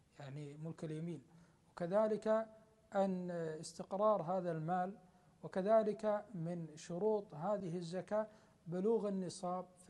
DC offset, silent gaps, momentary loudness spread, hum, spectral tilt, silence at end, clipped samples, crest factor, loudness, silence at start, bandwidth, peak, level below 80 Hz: under 0.1%; none; 14 LU; none; -7 dB/octave; 0.25 s; under 0.1%; 18 dB; -40 LUFS; 0.2 s; 10.5 kHz; -22 dBFS; -80 dBFS